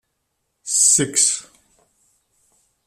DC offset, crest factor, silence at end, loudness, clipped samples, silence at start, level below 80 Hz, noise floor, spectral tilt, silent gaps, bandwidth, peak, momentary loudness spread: under 0.1%; 20 dB; 1.45 s; -15 LUFS; under 0.1%; 0.65 s; -66 dBFS; -73 dBFS; -1 dB/octave; none; 15.5 kHz; -2 dBFS; 14 LU